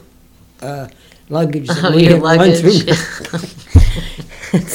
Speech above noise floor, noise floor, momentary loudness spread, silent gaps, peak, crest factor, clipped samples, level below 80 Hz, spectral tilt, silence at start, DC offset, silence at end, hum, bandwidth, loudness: 33 dB; -46 dBFS; 20 LU; none; 0 dBFS; 14 dB; 0.3%; -22 dBFS; -6 dB/octave; 0.6 s; under 0.1%; 0 s; none; 16.5 kHz; -13 LUFS